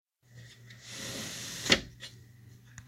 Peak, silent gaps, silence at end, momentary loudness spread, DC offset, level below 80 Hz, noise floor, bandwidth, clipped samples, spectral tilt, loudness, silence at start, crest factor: -6 dBFS; none; 0 s; 25 LU; under 0.1%; -58 dBFS; -55 dBFS; 16 kHz; under 0.1%; -2 dB/octave; -31 LUFS; 0.3 s; 32 dB